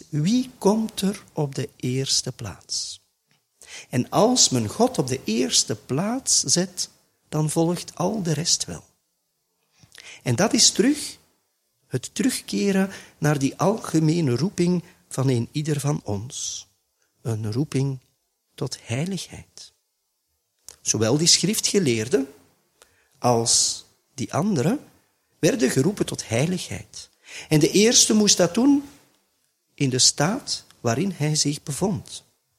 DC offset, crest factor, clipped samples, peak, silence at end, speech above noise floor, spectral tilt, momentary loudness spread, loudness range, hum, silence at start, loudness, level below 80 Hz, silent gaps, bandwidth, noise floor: under 0.1%; 20 dB; under 0.1%; -2 dBFS; 0.4 s; 52 dB; -4 dB/octave; 17 LU; 8 LU; none; 0.1 s; -22 LUFS; -58 dBFS; none; 16 kHz; -74 dBFS